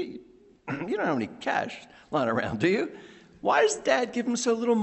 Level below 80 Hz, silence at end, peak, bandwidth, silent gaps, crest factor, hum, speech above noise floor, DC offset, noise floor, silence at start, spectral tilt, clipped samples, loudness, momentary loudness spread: -64 dBFS; 0 s; -8 dBFS; 8.4 kHz; none; 20 dB; none; 27 dB; under 0.1%; -53 dBFS; 0 s; -4.5 dB/octave; under 0.1%; -27 LUFS; 14 LU